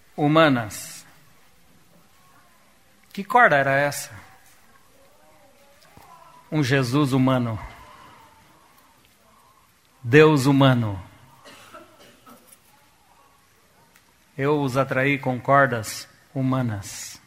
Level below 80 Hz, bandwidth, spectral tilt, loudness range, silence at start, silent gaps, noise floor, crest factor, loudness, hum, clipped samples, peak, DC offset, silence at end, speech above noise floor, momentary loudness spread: -58 dBFS; 16 kHz; -6 dB/octave; 7 LU; 0.15 s; none; -58 dBFS; 24 dB; -20 LUFS; none; under 0.1%; 0 dBFS; under 0.1%; 0.1 s; 38 dB; 21 LU